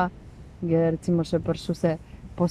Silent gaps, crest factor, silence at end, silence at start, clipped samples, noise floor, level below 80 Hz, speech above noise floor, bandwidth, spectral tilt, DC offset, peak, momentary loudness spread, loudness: none; 14 dB; 0 s; 0 s; under 0.1%; -44 dBFS; -48 dBFS; 20 dB; 10.5 kHz; -8 dB/octave; under 0.1%; -12 dBFS; 19 LU; -26 LUFS